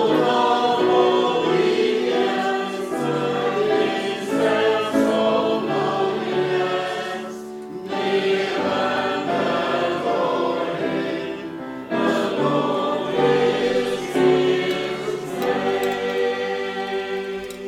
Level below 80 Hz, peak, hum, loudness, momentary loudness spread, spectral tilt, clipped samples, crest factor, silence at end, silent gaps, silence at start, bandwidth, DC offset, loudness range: -62 dBFS; -6 dBFS; none; -21 LUFS; 9 LU; -5 dB/octave; under 0.1%; 16 dB; 0 s; none; 0 s; 15 kHz; under 0.1%; 3 LU